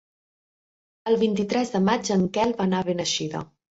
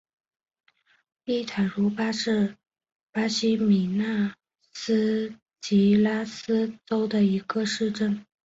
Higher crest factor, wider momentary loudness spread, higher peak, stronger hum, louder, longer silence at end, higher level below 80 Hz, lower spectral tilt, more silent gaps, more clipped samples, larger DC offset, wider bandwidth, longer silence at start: about the same, 18 dB vs 14 dB; about the same, 7 LU vs 9 LU; first, -8 dBFS vs -12 dBFS; neither; about the same, -24 LUFS vs -25 LUFS; about the same, 0.35 s vs 0.25 s; first, -60 dBFS vs -66 dBFS; about the same, -5 dB/octave vs -6 dB/octave; second, none vs 3.03-3.07 s, 5.42-5.46 s; neither; neither; about the same, 8 kHz vs 8 kHz; second, 1.05 s vs 1.25 s